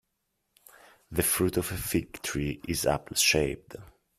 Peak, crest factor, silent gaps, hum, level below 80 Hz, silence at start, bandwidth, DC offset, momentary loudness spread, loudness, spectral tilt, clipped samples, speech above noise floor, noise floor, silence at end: -10 dBFS; 22 dB; none; none; -50 dBFS; 1.1 s; 16 kHz; under 0.1%; 12 LU; -28 LUFS; -3.5 dB/octave; under 0.1%; 50 dB; -79 dBFS; 0.35 s